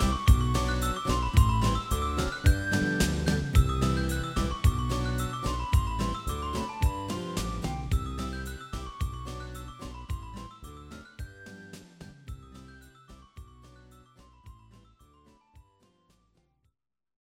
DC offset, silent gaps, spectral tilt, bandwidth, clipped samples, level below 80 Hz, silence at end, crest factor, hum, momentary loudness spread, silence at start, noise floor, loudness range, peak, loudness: under 0.1%; none; -5.5 dB/octave; 16.5 kHz; under 0.1%; -32 dBFS; 2.85 s; 22 dB; none; 21 LU; 0 s; -77 dBFS; 21 LU; -8 dBFS; -29 LUFS